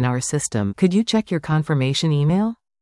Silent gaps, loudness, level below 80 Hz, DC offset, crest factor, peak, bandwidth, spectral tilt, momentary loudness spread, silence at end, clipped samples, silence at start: none; -20 LUFS; -52 dBFS; under 0.1%; 14 dB; -6 dBFS; 12 kHz; -5.5 dB/octave; 4 LU; 0.3 s; under 0.1%; 0 s